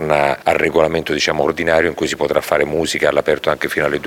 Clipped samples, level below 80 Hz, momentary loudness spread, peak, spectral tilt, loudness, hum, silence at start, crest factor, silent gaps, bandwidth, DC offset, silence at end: under 0.1%; -42 dBFS; 3 LU; 0 dBFS; -4 dB/octave; -16 LUFS; none; 0 s; 16 dB; none; 17 kHz; under 0.1%; 0 s